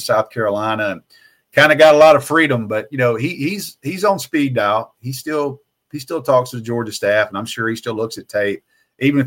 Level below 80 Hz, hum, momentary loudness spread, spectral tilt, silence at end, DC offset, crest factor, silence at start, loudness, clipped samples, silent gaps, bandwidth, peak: -62 dBFS; none; 15 LU; -5 dB/octave; 0 s; under 0.1%; 16 dB; 0 s; -16 LUFS; under 0.1%; none; 17 kHz; 0 dBFS